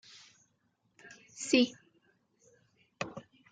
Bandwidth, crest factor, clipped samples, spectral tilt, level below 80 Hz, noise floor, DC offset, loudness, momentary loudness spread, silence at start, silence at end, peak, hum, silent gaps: 9.6 kHz; 24 dB; under 0.1%; -3 dB/octave; -80 dBFS; -76 dBFS; under 0.1%; -32 LUFS; 27 LU; 1.05 s; 0.3 s; -14 dBFS; none; none